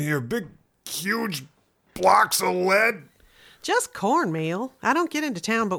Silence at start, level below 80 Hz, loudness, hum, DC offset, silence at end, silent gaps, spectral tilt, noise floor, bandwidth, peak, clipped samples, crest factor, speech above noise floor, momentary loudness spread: 0 s; -62 dBFS; -23 LUFS; none; under 0.1%; 0 s; none; -4 dB/octave; -54 dBFS; over 20 kHz; -6 dBFS; under 0.1%; 18 dB; 31 dB; 16 LU